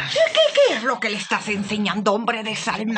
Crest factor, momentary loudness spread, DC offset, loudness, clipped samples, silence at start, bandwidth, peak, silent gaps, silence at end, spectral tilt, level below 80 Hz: 16 dB; 7 LU; under 0.1%; -20 LUFS; under 0.1%; 0 s; 9.6 kHz; -4 dBFS; none; 0 s; -3.5 dB/octave; -64 dBFS